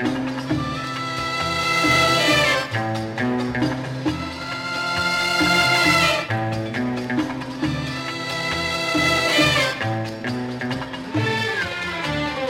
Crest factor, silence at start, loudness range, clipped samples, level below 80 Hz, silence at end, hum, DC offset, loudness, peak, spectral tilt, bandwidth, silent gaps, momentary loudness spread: 18 dB; 0 s; 2 LU; under 0.1%; -46 dBFS; 0 s; none; under 0.1%; -21 LUFS; -4 dBFS; -4 dB/octave; 16.5 kHz; none; 11 LU